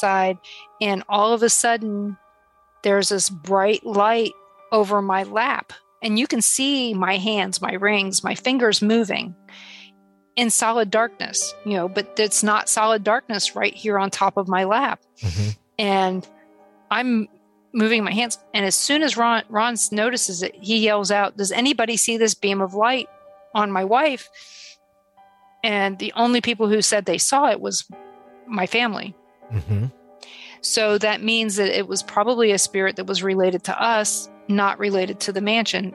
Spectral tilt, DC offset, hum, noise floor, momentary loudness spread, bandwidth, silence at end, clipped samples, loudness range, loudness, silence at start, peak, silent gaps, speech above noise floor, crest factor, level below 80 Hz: -3 dB/octave; under 0.1%; none; -58 dBFS; 9 LU; 13 kHz; 0 s; under 0.1%; 3 LU; -20 LUFS; 0 s; -6 dBFS; none; 38 dB; 16 dB; -58 dBFS